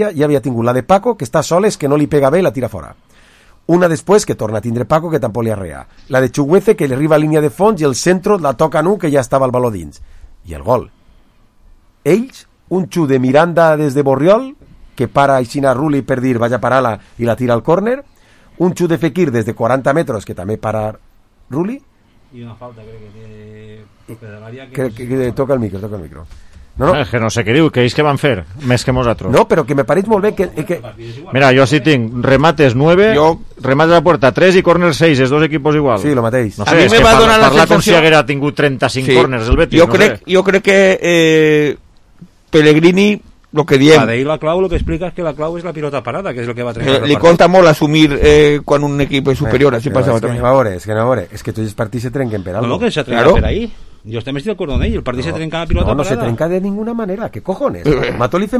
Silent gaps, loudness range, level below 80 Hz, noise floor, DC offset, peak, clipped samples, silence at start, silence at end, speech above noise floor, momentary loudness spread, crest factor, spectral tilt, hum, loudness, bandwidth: none; 9 LU; -32 dBFS; -47 dBFS; under 0.1%; 0 dBFS; 0.1%; 0 s; 0 s; 35 dB; 13 LU; 12 dB; -6 dB/octave; none; -12 LUFS; 15 kHz